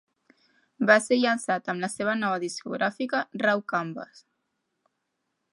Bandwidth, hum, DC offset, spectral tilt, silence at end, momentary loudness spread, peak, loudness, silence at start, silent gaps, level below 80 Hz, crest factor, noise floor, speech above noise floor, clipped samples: 11.5 kHz; none; under 0.1%; -4 dB/octave; 1.35 s; 11 LU; -4 dBFS; -26 LUFS; 0.8 s; none; -76 dBFS; 24 dB; -79 dBFS; 53 dB; under 0.1%